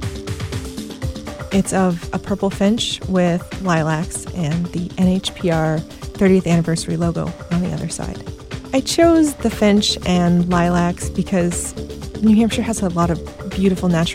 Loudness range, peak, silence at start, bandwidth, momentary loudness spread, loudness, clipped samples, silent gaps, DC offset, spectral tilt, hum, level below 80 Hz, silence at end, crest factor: 3 LU; -2 dBFS; 0 s; 15.5 kHz; 13 LU; -18 LUFS; under 0.1%; none; 0.2%; -5.5 dB/octave; none; -36 dBFS; 0 s; 16 dB